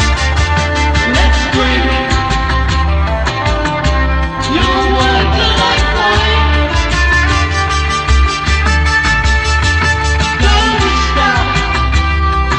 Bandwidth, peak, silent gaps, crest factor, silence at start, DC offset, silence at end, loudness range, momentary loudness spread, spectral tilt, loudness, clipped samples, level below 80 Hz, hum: 9.4 kHz; 0 dBFS; none; 12 dB; 0 s; under 0.1%; 0 s; 2 LU; 3 LU; -4.5 dB/octave; -12 LUFS; under 0.1%; -16 dBFS; none